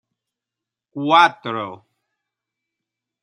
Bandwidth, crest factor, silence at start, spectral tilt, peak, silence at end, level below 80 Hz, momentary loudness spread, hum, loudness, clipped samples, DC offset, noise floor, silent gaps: 10.5 kHz; 22 dB; 0.95 s; -4.5 dB/octave; 0 dBFS; 1.45 s; -76 dBFS; 19 LU; none; -17 LUFS; under 0.1%; under 0.1%; -86 dBFS; none